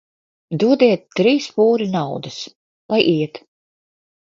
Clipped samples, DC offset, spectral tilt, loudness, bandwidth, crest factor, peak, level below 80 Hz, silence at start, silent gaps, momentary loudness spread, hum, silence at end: under 0.1%; under 0.1%; -6 dB/octave; -17 LUFS; 7.6 kHz; 20 dB; 0 dBFS; -66 dBFS; 0.5 s; 2.55-2.89 s; 14 LU; none; 0.95 s